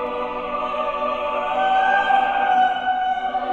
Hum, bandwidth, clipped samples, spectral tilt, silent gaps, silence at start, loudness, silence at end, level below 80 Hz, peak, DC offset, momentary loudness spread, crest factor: none; 7.2 kHz; under 0.1%; -4 dB/octave; none; 0 s; -20 LUFS; 0 s; -50 dBFS; -6 dBFS; under 0.1%; 8 LU; 14 dB